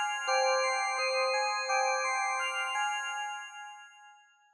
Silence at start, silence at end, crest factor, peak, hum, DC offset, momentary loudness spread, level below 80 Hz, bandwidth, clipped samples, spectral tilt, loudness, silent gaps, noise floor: 0 s; 0.4 s; 16 dB; -16 dBFS; none; under 0.1%; 14 LU; under -90 dBFS; 11.5 kHz; under 0.1%; 5 dB/octave; -30 LUFS; none; -59 dBFS